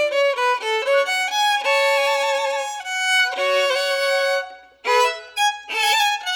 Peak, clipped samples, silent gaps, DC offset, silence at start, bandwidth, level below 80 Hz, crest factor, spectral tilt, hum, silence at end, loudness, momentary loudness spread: -6 dBFS; under 0.1%; none; under 0.1%; 0 s; 19.5 kHz; -72 dBFS; 14 dB; 2.5 dB/octave; none; 0 s; -19 LUFS; 5 LU